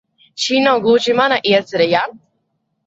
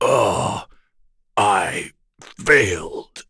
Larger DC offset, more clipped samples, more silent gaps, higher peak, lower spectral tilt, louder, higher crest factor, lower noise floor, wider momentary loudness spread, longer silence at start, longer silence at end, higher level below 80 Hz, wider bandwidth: neither; neither; neither; about the same, 0 dBFS vs 0 dBFS; about the same, -4 dB/octave vs -3.5 dB/octave; first, -15 LUFS vs -19 LUFS; about the same, 16 dB vs 20 dB; first, -69 dBFS vs -58 dBFS; second, 9 LU vs 16 LU; first, 0.35 s vs 0 s; first, 0.7 s vs 0.1 s; second, -62 dBFS vs -48 dBFS; second, 7.8 kHz vs 11 kHz